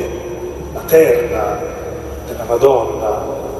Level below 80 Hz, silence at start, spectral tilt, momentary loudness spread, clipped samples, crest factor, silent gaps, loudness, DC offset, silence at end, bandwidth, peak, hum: -34 dBFS; 0 s; -5.5 dB/octave; 15 LU; under 0.1%; 16 dB; none; -16 LUFS; under 0.1%; 0 s; 14 kHz; 0 dBFS; none